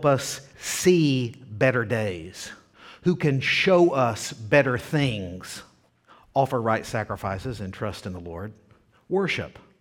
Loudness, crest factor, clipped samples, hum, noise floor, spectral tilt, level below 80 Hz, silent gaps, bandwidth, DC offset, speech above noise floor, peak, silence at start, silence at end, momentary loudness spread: -24 LUFS; 20 dB; under 0.1%; none; -57 dBFS; -5 dB/octave; -54 dBFS; none; 17 kHz; under 0.1%; 33 dB; -4 dBFS; 0 s; 0.3 s; 17 LU